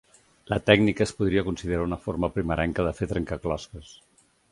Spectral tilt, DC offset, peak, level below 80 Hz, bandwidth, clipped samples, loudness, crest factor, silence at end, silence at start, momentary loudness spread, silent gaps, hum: -6 dB/octave; under 0.1%; -2 dBFS; -42 dBFS; 11.5 kHz; under 0.1%; -26 LUFS; 24 dB; 0.6 s; 0.5 s; 11 LU; none; none